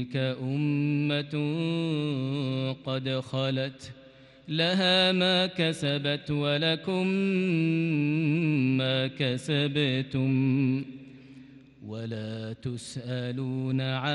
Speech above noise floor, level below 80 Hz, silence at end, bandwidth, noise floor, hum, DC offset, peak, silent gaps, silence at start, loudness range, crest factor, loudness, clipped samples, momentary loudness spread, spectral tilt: 23 dB; -66 dBFS; 0 s; 11.5 kHz; -50 dBFS; none; under 0.1%; -12 dBFS; none; 0 s; 6 LU; 16 dB; -27 LUFS; under 0.1%; 12 LU; -6.5 dB/octave